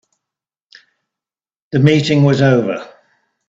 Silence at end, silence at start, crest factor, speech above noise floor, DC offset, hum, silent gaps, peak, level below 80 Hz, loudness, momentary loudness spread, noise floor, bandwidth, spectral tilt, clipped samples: 0.6 s; 1.75 s; 16 dB; 77 dB; under 0.1%; none; none; 0 dBFS; -54 dBFS; -13 LUFS; 11 LU; -89 dBFS; 7.8 kHz; -7 dB/octave; under 0.1%